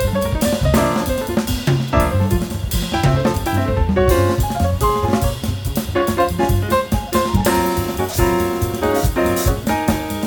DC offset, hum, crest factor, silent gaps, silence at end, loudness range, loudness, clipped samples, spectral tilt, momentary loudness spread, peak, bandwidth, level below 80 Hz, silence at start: under 0.1%; none; 16 dB; none; 0 s; 1 LU; -18 LUFS; under 0.1%; -5.5 dB/octave; 4 LU; 0 dBFS; 19.5 kHz; -26 dBFS; 0 s